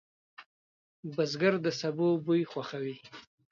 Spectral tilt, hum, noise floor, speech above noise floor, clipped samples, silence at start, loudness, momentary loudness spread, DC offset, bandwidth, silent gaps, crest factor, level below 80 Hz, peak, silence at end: -6 dB/octave; none; under -90 dBFS; over 59 dB; under 0.1%; 0.4 s; -31 LUFS; 19 LU; under 0.1%; 7.2 kHz; 0.46-1.03 s; 20 dB; -80 dBFS; -14 dBFS; 0.3 s